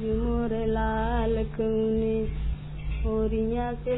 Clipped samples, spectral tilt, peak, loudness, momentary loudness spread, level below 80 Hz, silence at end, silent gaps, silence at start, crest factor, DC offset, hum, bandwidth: under 0.1%; -11.5 dB/octave; -14 dBFS; -28 LUFS; 7 LU; -32 dBFS; 0 s; none; 0 s; 12 dB; under 0.1%; none; 4 kHz